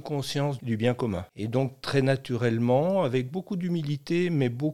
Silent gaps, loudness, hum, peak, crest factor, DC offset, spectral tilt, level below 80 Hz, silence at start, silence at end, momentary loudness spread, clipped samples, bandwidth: none; -27 LUFS; none; -10 dBFS; 18 dB; 0.2%; -7 dB/octave; -64 dBFS; 0 s; 0 s; 7 LU; under 0.1%; 13.5 kHz